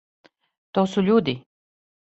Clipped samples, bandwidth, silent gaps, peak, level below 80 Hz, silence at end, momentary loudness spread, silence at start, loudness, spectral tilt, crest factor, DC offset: under 0.1%; 8 kHz; none; -6 dBFS; -60 dBFS; 0.8 s; 10 LU; 0.75 s; -22 LUFS; -7 dB/octave; 18 dB; under 0.1%